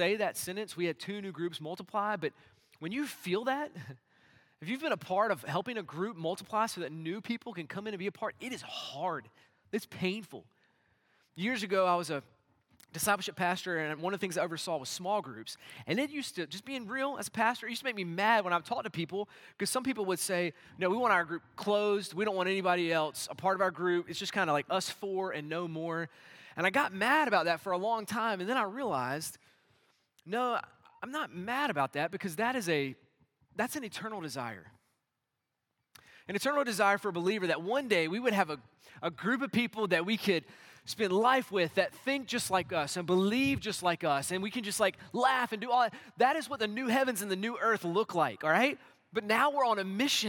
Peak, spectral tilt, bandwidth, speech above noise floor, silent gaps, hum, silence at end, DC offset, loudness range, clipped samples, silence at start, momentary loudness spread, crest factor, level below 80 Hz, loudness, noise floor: -12 dBFS; -4 dB/octave; 18 kHz; 53 dB; none; none; 0 s; under 0.1%; 7 LU; under 0.1%; 0 s; 11 LU; 22 dB; -78 dBFS; -32 LUFS; -86 dBFS